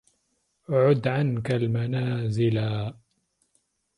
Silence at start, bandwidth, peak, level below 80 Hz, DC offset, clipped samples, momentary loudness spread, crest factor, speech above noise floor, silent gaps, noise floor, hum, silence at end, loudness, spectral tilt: 0.7 s; 11 kHz; -10 dBFS; -58 dBFS; under 0.1%; under 0.1%; 7 LU; 18 dB; 49 dB; none; -73 dBFS; none; 1.05 s; -25 LUFS; -8.5 dB/octave